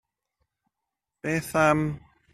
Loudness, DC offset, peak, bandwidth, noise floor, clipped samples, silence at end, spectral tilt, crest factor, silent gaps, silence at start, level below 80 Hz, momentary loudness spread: -25 LUFS; under 0.1%; -8 dBFS; 14 kHz; -86 dBFS; under 0.1%; 0.35 s; -6 dB/octave; 22 dB; none; 1.25 s; -56 dBFS; 14 LU